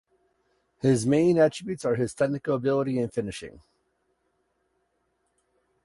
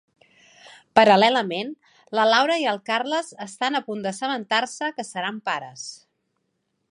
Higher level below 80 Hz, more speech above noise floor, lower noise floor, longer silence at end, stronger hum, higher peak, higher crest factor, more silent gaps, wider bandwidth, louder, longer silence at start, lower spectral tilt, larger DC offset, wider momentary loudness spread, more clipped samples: first, -60 dBFS vs -74 dBFS; about the same, 49 dB vs 52 dB; about the same, -74 dBFS vs -74 dBFS; first, 2.35 s vs 0.95 s; neither; second, -10 dBFS vs 0 dBFS; second, 18 dB vs 24 dB; neither; about the same, 11.5 kHz vs 11.5 kHz; second, -25 LUFS vs -22 LUFS; first, 0.85 s vs 0.7 s; first, -6.5 dB/octave vs -3.5 dB/octave; neither; second, 11 LU vs 14 LU; neither